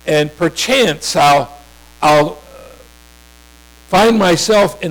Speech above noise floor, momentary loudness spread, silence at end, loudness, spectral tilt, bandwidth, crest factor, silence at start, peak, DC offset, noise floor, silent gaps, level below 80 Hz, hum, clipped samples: 31 dB; 6 LU; 0 s; -13 LUFS; -4 dB/octave; over 20 kHz; 8 dB; 0.05 s; -6 dBFS; under 0.1%; -43 dBFS; none; -42 dBFS; 60 Hz at -45 dBFS; under 0.1%